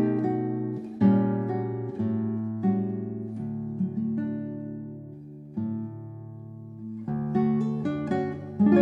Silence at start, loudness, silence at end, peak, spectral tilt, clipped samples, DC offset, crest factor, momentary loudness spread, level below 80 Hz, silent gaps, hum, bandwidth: 0 s; -28 LUFS; 0 s; -8 dBFS; -10.5 dB/octave; under 0.1%; under 0.1%; 20 dB; 16 LU; -62 dBFS; none; none; 4.7 kHz